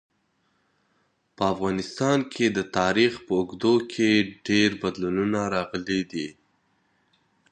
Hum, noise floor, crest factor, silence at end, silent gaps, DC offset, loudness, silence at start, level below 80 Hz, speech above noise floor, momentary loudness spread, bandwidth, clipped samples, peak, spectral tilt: none; -70 dBFS; 18 dB; 1.2 s; none; under 0.1%; -24 LUFS; 1.4 s; -58 dBFS; 46 dB; 7 LU; 9.6 kHz; under 0.1%; -6 dBFS; -5 dB/octave